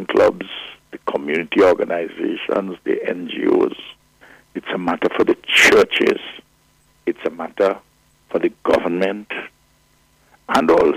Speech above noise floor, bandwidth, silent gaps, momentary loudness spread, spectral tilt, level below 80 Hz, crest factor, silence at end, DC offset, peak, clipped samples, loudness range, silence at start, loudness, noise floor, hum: 39 dB; 15.5 kHz; none; 16 LU; -4 dB/octave; -54 dBFS; 16 dB; 0 s; under 0.1%; -4 dBFS; under 0.1%; 5 LU; 0 s; -18 LUFS; -57 dBFS; none